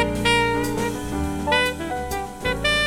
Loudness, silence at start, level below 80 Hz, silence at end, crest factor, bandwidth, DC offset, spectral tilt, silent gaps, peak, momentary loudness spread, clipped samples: -22 LUFS; 0 s; -36 dBFS; 0 s; 16 dB; 17.5 kHz; under 0.1%; -4 dB/octave; none; -6 dBFS; 8 LU; under 0.1%